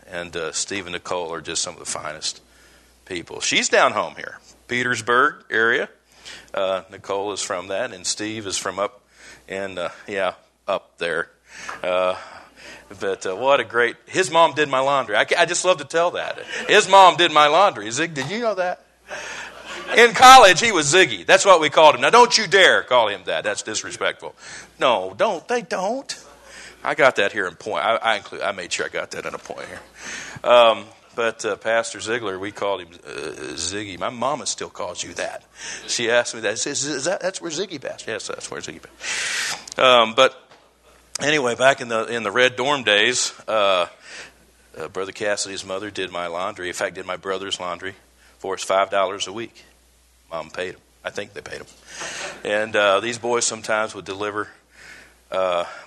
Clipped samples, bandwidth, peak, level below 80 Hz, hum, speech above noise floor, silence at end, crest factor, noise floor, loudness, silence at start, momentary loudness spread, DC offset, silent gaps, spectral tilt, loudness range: under 0.1%; 12.5 kHz; 0 dBFS; -58 dBFS; none; 36 dB; 0 s; 20 dB; -56 dBFS; -19 LUFS; 0.1 s; 19 LU; under 0.1%; none; -2 dB/octave; 12 LU